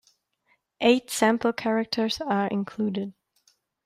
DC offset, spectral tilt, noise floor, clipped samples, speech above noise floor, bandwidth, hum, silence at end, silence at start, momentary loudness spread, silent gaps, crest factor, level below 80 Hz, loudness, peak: under 0.1%; -4.5 dB/octave; -70 dBFS; under 0.1%; 45 dB; 15.5 kHz; none; 0.75 s; 0.8 s; 7 LU; none; 20 dB; -66 dBFS; -25 LUFS; -6 dBFS